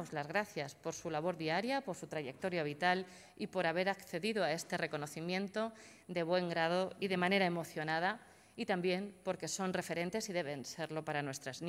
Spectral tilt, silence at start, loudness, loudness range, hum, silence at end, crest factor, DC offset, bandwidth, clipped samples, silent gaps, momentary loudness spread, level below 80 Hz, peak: -4.5 dB/octave; 0 s; -38 LUFS; 3 LU; none; 0 s; 20 dB; under 0.1%; 16 kHz; under 0.1%; none; 9 LU; -78 dBFS; -18 dBFS